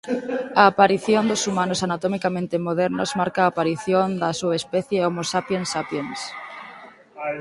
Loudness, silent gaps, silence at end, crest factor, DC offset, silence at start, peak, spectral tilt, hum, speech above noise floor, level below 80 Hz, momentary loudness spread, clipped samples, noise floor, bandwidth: -22 LUFS; none; 0 s; 22 dB; under 0.1%; 0.05 s; 0 dBFS; -4.5 dB/octave; none; 22 dB; -62 dBFS; 14 LU; under 0.1%; -44 dBFS; 11.5 kHz